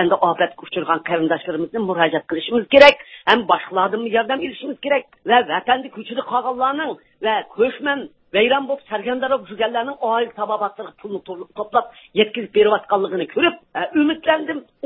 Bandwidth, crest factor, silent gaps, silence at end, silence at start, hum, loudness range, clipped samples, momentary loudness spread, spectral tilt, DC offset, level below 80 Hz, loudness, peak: 8 kHz; 20 dB; none; 0.25 s; 0 s; none; 6 LU; under 0.1%; 10 LU; -5.5 dB/octave; under 0.1%; -58 dBFS; -19 LUFS; 0 dBFS